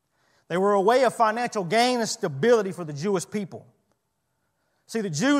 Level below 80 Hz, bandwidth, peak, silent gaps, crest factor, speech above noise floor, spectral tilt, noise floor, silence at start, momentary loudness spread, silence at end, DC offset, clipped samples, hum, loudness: -76 dBFS; 15 kHz; -6 dBFS; none; 18 dB; 53 dB; -4.5 dB/octave; -76 dBFS; 0.5 s; 12 LU; 0 s; under 0.1%; under 0.1%; none; -24 LUFS